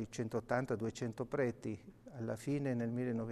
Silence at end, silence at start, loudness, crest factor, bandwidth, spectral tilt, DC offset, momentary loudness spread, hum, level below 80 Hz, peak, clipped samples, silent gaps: 0 s; 0 s; -39 LUFS; 20 dB; 13 kHz; -7 dB/octave; under 0.1%; 9 LU; none; -68 dBFS; -20 dBFS; under 0.1%; none